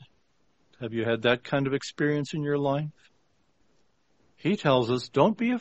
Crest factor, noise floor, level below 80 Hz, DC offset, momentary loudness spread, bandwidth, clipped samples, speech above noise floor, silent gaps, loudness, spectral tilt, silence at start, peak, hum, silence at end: 22 dB; -70 dBFS; -64 dBFS; under 0.1%; 8 LU; 8.2 kHz; under 0.1%; 44 dB; none; -27 LUFS; -6.5 dB/octave; 0.8 s; -6 dBFS; none; 0 s